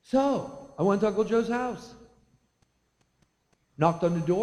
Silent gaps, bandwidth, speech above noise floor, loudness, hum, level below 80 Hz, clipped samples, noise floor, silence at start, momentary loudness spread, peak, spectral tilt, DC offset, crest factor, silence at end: none; 11.5 kHz; 46 dB; -27 LUFS; none; -60 dBFS; under 0.1%; -71 dBFS; 0.1 s; 9 LU; -8 dBFS; -7.5 dB/octave; under 0.1%; 20 dB; 0 s